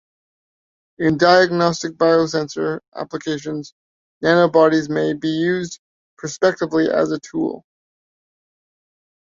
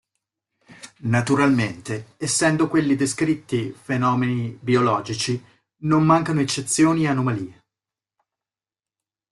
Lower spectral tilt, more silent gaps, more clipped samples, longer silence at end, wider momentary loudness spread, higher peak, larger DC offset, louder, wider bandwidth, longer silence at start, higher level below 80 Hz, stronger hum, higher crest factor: about the same, -5.5 dB/octave vs -5 dB/octave; first, 2.88-2.92 s, 3.72-4.21 s, 5.79-6.17 s vs none; neither; about the same, 1.7 s vs 1.8 s; first, 16 LU vs 11 LU; about the same, -2 dBFS vs -4 dBFS; neither; first, -18 LUFS vs -21 LUFS; second, 7.6 kHz vs 12.5 kHz; first, 1 s vs 0.7 s; about the same, -60 dBFS vs -58 dBFS; neither; about the same, 18 dB vs 18 dB